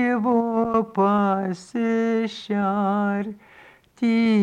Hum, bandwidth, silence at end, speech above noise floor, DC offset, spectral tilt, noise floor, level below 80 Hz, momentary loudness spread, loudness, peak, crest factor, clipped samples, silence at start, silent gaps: none; 9.2 kHz; 0 s; 29 dB; under 0.1%; -7.5 dB/octave; -51 dBFS; -62 dBFS; 7 LU; -22 LUFS; -8 dBFS; 12 dB; under 0.1%; 0 s; none